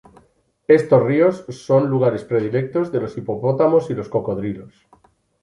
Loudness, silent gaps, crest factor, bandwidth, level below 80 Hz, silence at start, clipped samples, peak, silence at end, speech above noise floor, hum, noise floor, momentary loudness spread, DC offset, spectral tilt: -19 LUFS; none; 18 dB; 11 kHz; -56 dBFS; 0.7 s; under 0.1%; -2 dBFS; 0.75 s; 41 dB; none; -59 dBFS; 12 LU; under 0.1%; -8.5 dB/octave